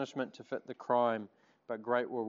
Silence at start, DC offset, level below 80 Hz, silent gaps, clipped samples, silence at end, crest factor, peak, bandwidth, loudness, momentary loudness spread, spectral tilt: 0 s; under 0.1%; under -90 dBFS; none; under 0.1%; 0 s; 18 dB; -16 dBFS; 7.4 kHz; -36 LUFS; 12 LU; -4 dB/octave